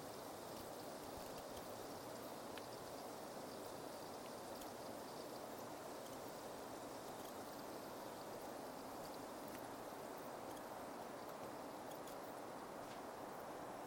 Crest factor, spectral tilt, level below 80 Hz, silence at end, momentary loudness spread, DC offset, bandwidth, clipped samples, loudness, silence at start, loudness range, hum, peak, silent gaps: 18 dB; -3.5 dB/octave; -76 dBFS; 0 s; 1 LU; under 0.1%; 17 kHz; under 0.1%; -51 LUFS; 0 s; 0 LU; none; -34 dBFS; none